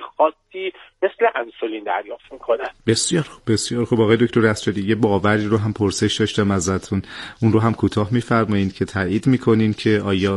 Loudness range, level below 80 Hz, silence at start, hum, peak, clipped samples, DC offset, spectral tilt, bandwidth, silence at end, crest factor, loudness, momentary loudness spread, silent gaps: 3 LU; -52 dBFS; 0 s; none; 0 dBFS; under 0.1%; under 0.1%; -5.5 dB/octave; 11.5 kHz; 0 s; 18 dB; -20 LUFS; 9 LU; none